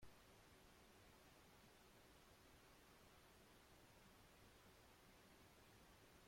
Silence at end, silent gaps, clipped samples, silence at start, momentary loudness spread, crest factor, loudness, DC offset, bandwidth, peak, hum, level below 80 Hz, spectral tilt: 0 s; none; under 0.1%; 0 s; 0 LU; 18 dB; -69 LUFS; under 0.1%; 16.5 kHz; -52 dBFS; none; -78 dBFS; -3.5 dB/octave